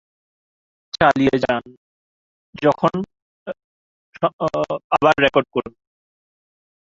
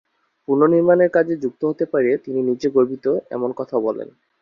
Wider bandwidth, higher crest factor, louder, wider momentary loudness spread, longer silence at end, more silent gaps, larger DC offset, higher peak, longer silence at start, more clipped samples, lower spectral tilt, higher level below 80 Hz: first, 7.8 kHz vs 6.8 kHz; about the same, 20 dB vs 16 dB; about the same, -19 LUFS vs -19 LUFS; first, 19 LU vs 10 LU; first, 1.25 s vs 0.35 s; first, 1.77-2.53 s, 3.22-3.46 s, 3.64-4.13 s, 4.33-4.39 s, 4.84-4.90 s vs none; neither; about the same, -2 dBFS vs -4 dBFS; first, 0.95 s vs 0.5 s; neither; second, -6 dB/octave vs -8.5 dB/octave; first, -54 dBFS vs -64 dBFS